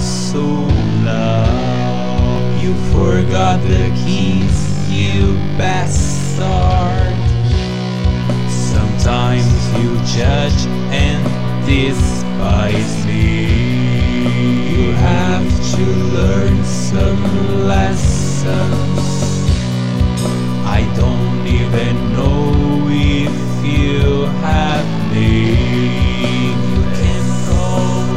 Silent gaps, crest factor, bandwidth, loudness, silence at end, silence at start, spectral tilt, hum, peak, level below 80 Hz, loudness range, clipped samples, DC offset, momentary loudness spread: none; 12 dB; 11.5 kHz; -15 LUFS; 0 s; 0 s; -6.5 dB/octave; none; -2 dBFS; -22 dBFS; 1 LU; under 0.1%; 8%; 3 LU